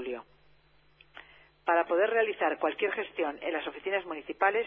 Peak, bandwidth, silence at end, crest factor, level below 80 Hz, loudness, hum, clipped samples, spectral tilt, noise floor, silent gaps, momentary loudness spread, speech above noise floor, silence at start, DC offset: -12 dBFS; 4.2 kHz; 0 s; 20 dB; -70 dBFS; -30 LUFS; none; under 0.1%; -6.5 dB/octave; -63 dBFS; none; 13 LU; 33 dB; 0 s; under 0.1%